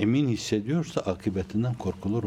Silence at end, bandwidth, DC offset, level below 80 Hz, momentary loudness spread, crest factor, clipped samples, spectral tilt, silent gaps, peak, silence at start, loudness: 0 s; 14 kHz; under 0.1%; -56 dBFS; 5 LU; 16 dB; under 0.1%; -6.5 dB/octave; none; -10 dBFS; 0 s; -28 LUFS